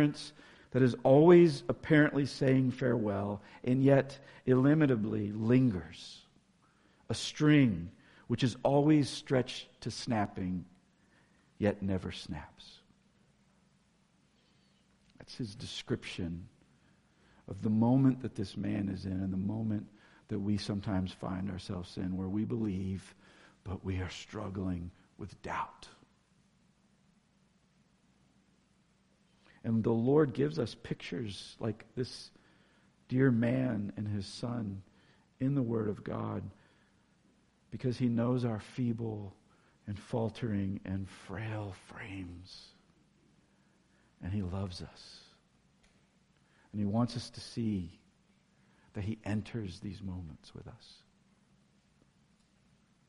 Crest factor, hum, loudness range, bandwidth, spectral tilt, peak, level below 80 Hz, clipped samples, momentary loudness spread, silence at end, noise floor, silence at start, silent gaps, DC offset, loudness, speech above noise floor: 24 dB; none; 15 LU; 11.5 kHz; -7 dB/octave; -10 dBFS; -62 dBFS; under 0.1%; 20 LU; 2.15 s; -70 dBFS; 0 s; none; under 0.1%; -33 LUFS; 38 dB